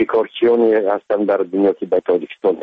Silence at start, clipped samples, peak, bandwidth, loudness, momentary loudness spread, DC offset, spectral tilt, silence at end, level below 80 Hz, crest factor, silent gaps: 0 s; under 0.1%; -6 dBFS; 4.6 kHz; -17 LUFS; 5 LU; under 0.1%; -8.5 dB/octave; 0 s; -60 dBFS; 12 dB; none